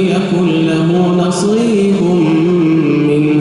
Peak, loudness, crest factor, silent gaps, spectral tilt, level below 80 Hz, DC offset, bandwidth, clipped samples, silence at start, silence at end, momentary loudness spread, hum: -2 dBFS; -12 LUFS; 8 dB; none; -7 dB/octave; -48 dBFS; under 0.1%; 11.5 kHz; under 0.1%; 0 s; 0 s; 2 LU; none